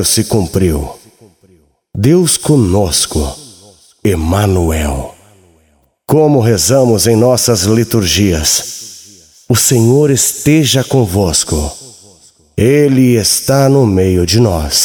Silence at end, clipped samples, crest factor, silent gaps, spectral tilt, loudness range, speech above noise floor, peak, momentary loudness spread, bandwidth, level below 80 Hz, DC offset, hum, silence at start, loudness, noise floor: 0 s; under 0.1%; 12 dB; none; -4.5 dB/octave; 3 LU; 44 dB; 0 dBFS; 11 LU; 19.5 kHz; -28 dBFS; under 0.1%; none; 0 s; -11 LUFS; -54 dBFS